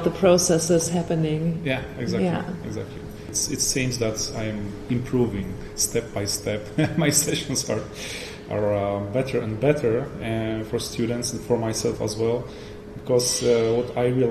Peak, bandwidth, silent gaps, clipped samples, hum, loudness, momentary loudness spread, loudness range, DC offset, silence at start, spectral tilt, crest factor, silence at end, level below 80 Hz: -4 dBFS; 13 kHz; none; under 0.1%; none; -24 LUFS; 12 LU; 2 LU; under 0.1%; 0 s; -4.5 dB/octave; 18 dB; 0 s; -44 dBFS